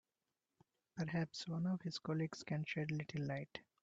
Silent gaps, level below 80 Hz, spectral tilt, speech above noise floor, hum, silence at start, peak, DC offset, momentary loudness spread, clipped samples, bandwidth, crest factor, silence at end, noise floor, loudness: none; -78 dBFS; -6 dB/octave; over 48 dB; none; 0.95 s; -26 dBFS; under 0.1%; 6 LU; under 0.1%; 7.8 kHz; 18 dB; 0.25 s; under -90 dBFS; -43 LUFS